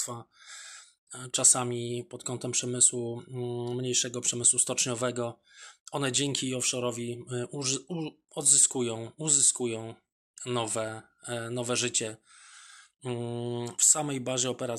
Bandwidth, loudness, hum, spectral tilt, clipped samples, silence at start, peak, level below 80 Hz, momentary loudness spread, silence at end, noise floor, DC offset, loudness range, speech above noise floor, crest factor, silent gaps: 15 kHz; -27 LUFS; none; -2.5 dB/octave; under 0.1%; 0 s; -8 dBFS; -74 dBFS; 17 LU; 0 s; -53 dBFS; under 0.1%; 7 LU; 23 dB; 22 dB; 0.98-1.07 s, 5.80-5.85 s, 10.12-10.34 s